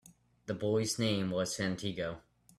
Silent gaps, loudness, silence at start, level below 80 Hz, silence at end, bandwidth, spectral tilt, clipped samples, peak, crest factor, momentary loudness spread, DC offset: none; -34 LUFS; 0.05 s; -66 dBFS; 0.4 s; 14.5 kHz; -4.5 dB/octave; under 0.1%; -18 dBFS; 18 dB; 11 LU; under 0.1%